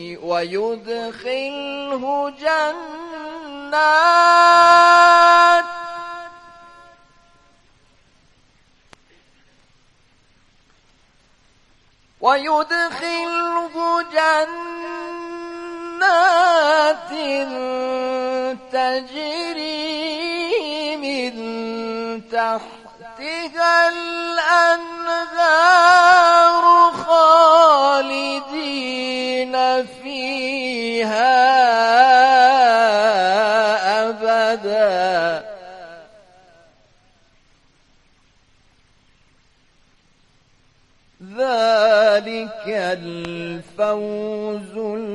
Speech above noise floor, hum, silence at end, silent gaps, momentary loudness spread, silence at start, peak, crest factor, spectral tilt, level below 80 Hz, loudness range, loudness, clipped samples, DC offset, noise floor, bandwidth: 41 dB; none; 0 s; none; 18 LU; 0 s; 0 dBFS; 18 dB; -2.5 dB/octave; -62 dBFS; 11 LU; -16 LUFS; under 0.1%; under 0.1%; -57 dBFS; 11.5 kHz